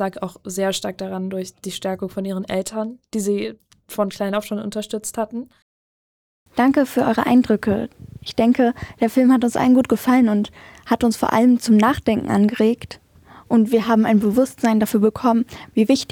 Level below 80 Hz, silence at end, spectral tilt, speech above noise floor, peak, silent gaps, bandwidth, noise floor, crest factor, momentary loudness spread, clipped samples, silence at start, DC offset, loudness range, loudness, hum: -52 dBFS; 0.05 s; -5.5 dB/octave; over 71 dB; -4 dBFS; 5.62-6.46 s; 18 kHz; under -90 dBFS; 16 dB; 12 LU; under 0.1%; 0 s; under 0.1%; 8 LU; -19 LUFS; none